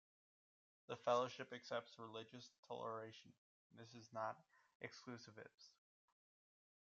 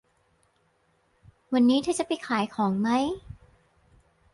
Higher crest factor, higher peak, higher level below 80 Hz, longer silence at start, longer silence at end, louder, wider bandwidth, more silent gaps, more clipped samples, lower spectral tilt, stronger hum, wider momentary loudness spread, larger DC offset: first, 24 dB vs 18 dB; second, -28 dBFS vs -10 dBFS; second, under -90 dBFS vs -60 dBFS; second, 0.9 s vs 1.5 s; first, 1.15 s vs 1 s; second, -49 LUFS vs -26 LUFS; second, 7.6 kHz vs 11.5 kHz; first, 2.59-2.63 s, 3.38-3.70 s, 4.75-4.80 s, 5.54-5.58 s vs none; neither; second, -3 dB/octave vs -5 dB/octave; neither; first, 20 LU vs 7 LU; neither